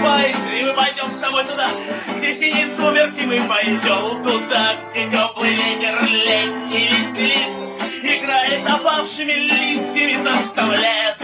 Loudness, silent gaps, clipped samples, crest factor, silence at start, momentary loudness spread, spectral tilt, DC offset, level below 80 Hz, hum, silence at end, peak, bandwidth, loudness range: -17 LUFS; none; under 0.1%; 16 dB; 0 s; 5 LU; -7 dB/octave; under 0.1%; -66 dBFS; none; 0 s; -2 dBFS; 4 kHz; 1 LU